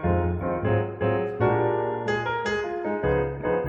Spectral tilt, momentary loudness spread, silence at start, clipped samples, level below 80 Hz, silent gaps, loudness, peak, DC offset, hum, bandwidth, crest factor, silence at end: -7.5 dB/octave; 3 LU; 0 s; under 0.1%; -42 dBFS; none; -26 LUFS; -10 dBFS; under 0.1%; none; 7.2 kHz; 16 dB; 0 s